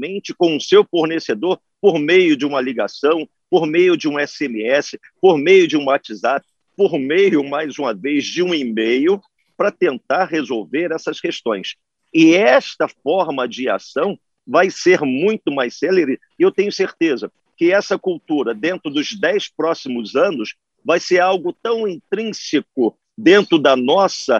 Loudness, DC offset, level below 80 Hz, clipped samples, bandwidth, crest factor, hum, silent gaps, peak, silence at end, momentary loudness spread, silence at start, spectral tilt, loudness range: -17 LUFS; under 0.1%; -70 dBFS; under 0.1%; 7.6 kHz; 16 dB; none; none; 0 dBFS; 0 s; 10 LU; 0 s; -4.5 dB/octave; 3 LU